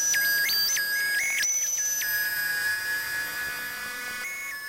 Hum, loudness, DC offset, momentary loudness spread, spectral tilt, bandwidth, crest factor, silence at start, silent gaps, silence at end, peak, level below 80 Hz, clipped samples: none; -25 LUFS; under 0.1%; 10 LU; 2.5 dB/octave; 16 kHz; 12 dB; 0 s; none; 0 s; -16 dBFS; -62 dBFS; under 0.1%